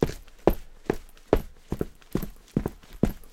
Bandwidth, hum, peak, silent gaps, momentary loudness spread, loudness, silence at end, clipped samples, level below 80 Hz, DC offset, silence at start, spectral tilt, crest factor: 17 kHz; none; 0 dBFS; none; 8 LU; -31 LUFS; 0.05 s; under 0.1%; -36 dBFS; under 0.1%; 0 s; -7.5 dB/octave; 28 dB